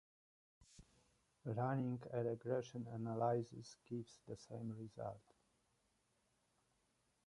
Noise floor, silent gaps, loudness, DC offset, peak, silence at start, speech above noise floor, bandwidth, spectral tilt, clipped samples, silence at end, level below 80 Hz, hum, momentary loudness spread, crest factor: -82 dBFS; none; -45 LUFS; under 0.1%; -26 dBFS; 0.6 s; 38 dB; 11 kHz; -7.5 dB/octave; under 0.1%; 2.05 s; -78 dBFS; none; 13 LU; 22 dB